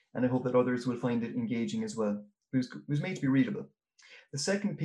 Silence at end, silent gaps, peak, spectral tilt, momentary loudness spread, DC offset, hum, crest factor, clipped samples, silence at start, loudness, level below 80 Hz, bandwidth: 0 s; none; -14 dBFS; -6 dB/octave; 7 LU; under 0.1%; none; 16 dB; under 0.1%; 0.15 s; -32 LUFS; -74 dBFS; 11 kHz